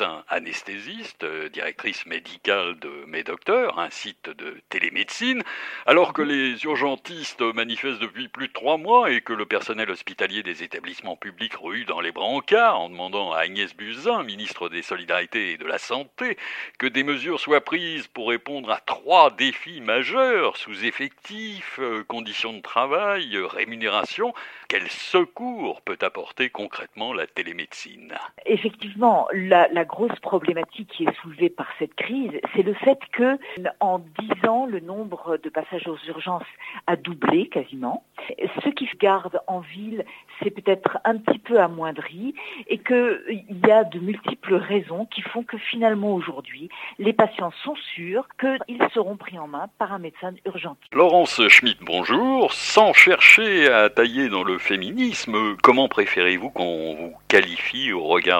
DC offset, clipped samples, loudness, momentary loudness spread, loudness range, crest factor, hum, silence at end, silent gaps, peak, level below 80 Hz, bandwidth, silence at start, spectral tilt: under 0.1%; under 0.1%; -21 LUFS; 15 LU; 11 LU; 22 dB; none; 0 s; none; 0 dBFS; -68 dBFS; 16.5 kHz; 0 s; -4 dB/octave